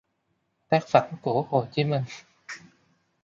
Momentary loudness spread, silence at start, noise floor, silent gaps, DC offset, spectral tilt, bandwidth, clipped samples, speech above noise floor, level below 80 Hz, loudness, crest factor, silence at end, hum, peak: 20 LU; 0.7 s; -75 dBFS; none; under 0.1%; -6.5 dB/octave; 7.6 kHz; under 0.1%; 50 dB; -68 dBFS; -25 LUFS; 24 dB; 0.65 s; none; -4 dBFS